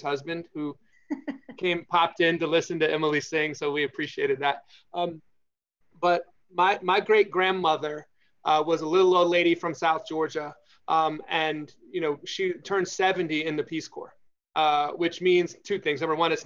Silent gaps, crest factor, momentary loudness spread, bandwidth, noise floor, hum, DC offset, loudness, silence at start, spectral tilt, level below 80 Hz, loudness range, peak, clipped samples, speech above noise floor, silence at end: none; 18 dB; 13 LU; 7.6 kHz; -72 dBFS; none; under 0.1%; -26 LUFS; 0 s; -4.5 dB/octave; -76 dBFS; 5 LU; -8 dBFS; under 0.1%; 46 dB; 0 s